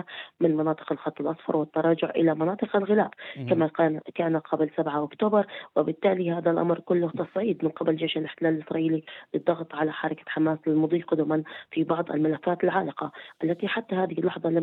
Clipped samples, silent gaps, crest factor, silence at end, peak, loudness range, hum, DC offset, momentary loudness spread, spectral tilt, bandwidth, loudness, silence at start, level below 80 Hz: under 0.1%; none; 16 dB; 0 s; -10 dBFS; 2 LU; none; under 0.1%; 6 LU; -10 dB/octave; 4.1 kHz; -26 LUFS; 0 s; -78 dBFS